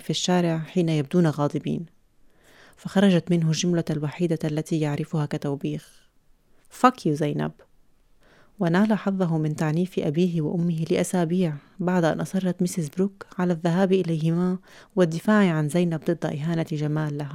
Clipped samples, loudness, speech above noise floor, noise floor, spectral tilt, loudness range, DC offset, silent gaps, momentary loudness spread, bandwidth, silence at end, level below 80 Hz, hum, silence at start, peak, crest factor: under 0.1%; -24 LUFS; 35 dB; -58 dBFS; -6.5 dB/octave; 3 LU; under 0.1%; none; 8 LU; 14 kHz; 0 s; -62 dBFS; none; 0 s; -2 dBFS; 22 dB